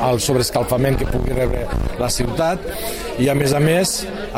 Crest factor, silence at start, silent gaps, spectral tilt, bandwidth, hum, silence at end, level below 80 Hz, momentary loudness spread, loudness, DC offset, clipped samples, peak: 14 dB; 0 s; none; -5 dB/octave; 16.5 kHz; none; 0 s; -28 dBFS; 8 LU; -19 LUFS; under 0.1%; under 0.1%; -4 dBFS